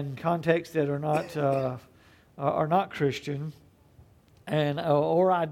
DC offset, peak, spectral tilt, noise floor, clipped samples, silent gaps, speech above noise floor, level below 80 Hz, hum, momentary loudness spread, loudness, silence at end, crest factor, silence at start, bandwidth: under 0.1%; -10 dBFS; -7.5 dB/octave; -57 dBFS; under 0.1%; none; 30 dB; -64 dBFS; none; 11 LU; -27 LUFS; 0 s; 18 dB; 0 s; 15.5 kHz